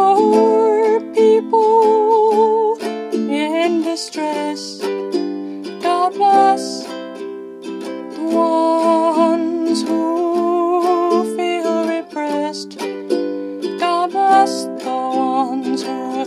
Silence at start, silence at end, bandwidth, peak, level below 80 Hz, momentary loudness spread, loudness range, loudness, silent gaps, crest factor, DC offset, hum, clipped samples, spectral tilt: 0 s; 0 s; 13.5 kHz; -2 dBFS; -72 dBFS; 13 LU; 5 LU; -17 LUFS; none; 16 dB; under 0.1%; none; under 0.1%; -4.5 dB/octave